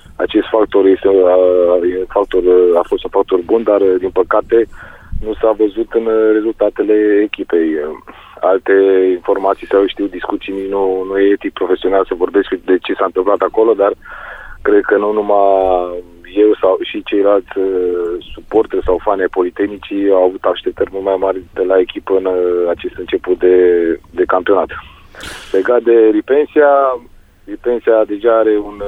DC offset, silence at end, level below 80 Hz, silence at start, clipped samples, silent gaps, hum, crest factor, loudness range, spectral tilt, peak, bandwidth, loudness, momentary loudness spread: under 0.1%; 0 s; -38 dBFS; 0.2 s; under 0.1%; none; none; 12 dB; 3 LU; -6.5 dB/octave; 0 dBFS; 4.9 kHz; -13 LUFS; 10 LU